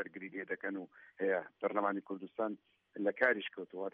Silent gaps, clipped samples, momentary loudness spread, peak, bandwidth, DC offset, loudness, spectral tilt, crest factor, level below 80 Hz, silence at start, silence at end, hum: none; under 0.1%; 13 LU; -16 dBFS; 5 kHz; under 0.1%; -37 LUFS; -3 dB/octave; 22 dB; -88 dBFS; 0 s; 0.05 s; none